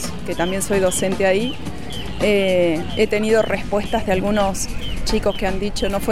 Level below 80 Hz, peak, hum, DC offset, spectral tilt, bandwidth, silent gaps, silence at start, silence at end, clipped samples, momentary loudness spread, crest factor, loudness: -32 dBFS; -4 dBFS; none; 4%; -4.5 dB/octave; 16 kHz; none; 0 s; 0 s; under 0.1%; 9 LU; 14 dB; -20 LUFS